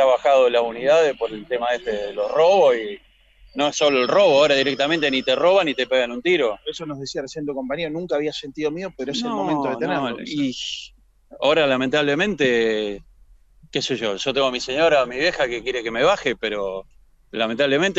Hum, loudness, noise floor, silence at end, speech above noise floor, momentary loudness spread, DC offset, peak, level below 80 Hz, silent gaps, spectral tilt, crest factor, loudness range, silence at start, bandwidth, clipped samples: none; -20 LUFS; -51 dBFS; 0 s; 31 dB; 13 LU; under 0.1%; -6 dBFS; -54 dBFS; none; -4 dB/octave; 14 dB; 7 LU; 0 s; 8 kHz; under 0.1%